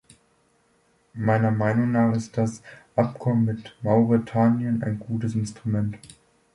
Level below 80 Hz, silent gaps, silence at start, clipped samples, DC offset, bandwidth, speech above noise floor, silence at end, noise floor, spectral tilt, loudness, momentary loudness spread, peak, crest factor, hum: -56 dBFS; none; 1.15 s; under 0.1%; under 0.1%; 11 kHz; 41 dB; 0.5 s; -64 dBFS; -8.5 dB/octave; -24 LUFS; 8 LU; -6 dBFS; 18 dB; none